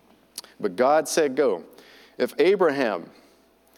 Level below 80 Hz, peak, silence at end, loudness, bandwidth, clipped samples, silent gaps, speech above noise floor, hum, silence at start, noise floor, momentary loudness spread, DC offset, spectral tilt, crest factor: -76 dBFS; -6 dBFS; 0.75 s; -23 LUFS; 18 kHz; under 0.1%; none; 36 dB; none; 0.35 s; -58 dBFS; 16 LU; under 0.1%; -4 dB/octave; 18 dB